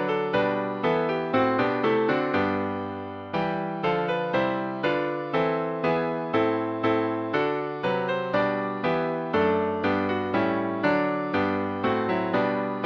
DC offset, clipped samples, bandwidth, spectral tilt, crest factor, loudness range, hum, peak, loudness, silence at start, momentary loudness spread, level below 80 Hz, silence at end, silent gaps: under 0.1%; under 0.1%; 7 kHz; -8 dB/octave; 16 dB; 1 LU; none; -10 dBFS; -26 LUFS; 0 s; 4 LU; -62 dBFS; 0 s; none